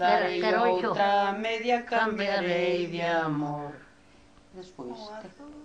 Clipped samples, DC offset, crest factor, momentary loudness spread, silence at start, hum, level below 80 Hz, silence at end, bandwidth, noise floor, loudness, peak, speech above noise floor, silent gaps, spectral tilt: under 0.1%; under 0.1%; 18 dB; 18 LU; 0 s; none; -66 dBFS; 0 s; 9.4 kHz; -57 dBFS; -27 LUFS; -10 dBFS; 30 dB; none; -5.5 dB/octave